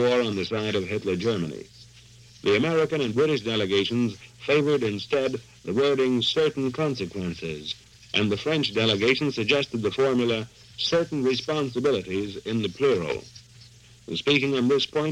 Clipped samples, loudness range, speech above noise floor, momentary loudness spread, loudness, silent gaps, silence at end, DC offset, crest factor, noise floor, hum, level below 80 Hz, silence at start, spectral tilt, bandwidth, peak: under 0.1%; 2 LU; 26 dB; 10 LU; -25 LUFS; none; 0 s; under 0.1%; 20 dB; -51 dBFS; none; -58 dBFS; 0 s; -5.5 dB/octave; 11.5 kHz; -4 dBFS